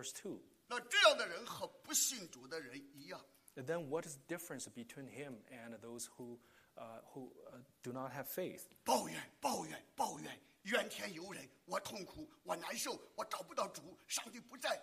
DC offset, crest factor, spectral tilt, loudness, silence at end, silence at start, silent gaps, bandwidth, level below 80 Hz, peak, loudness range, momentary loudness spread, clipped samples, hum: under 0.1%; 26 dB; -1.5 dB/octave; -41 LUFS; 0 s; 0 s; none; 15 kHz; -82 dBFS; -16 dBFS; 13 LU; 18 LU; under 0.1%; none